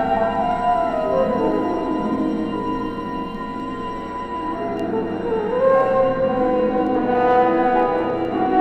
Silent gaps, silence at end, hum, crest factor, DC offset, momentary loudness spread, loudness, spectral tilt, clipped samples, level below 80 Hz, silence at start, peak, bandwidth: none; 0 s; none; 16 dB; under 0.1%; 11 LU; -20 LUFS; -8 dB/octave; under 0.1%; -42 dBFS; 0 s; -4 dBFS; 8.4 kHz